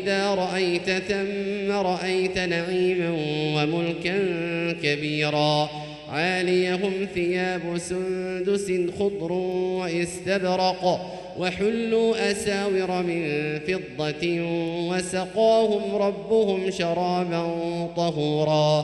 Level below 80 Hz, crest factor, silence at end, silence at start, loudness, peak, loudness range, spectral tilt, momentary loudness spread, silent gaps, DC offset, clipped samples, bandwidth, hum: -56 dBFS; 16 dB; 0 s; 0 s; -24 LUFS; -10 dBFS; 2 LU; -5.5 dB/octave; 6 LU; none; under 0.1%; under 0.1%; 12 kHz; none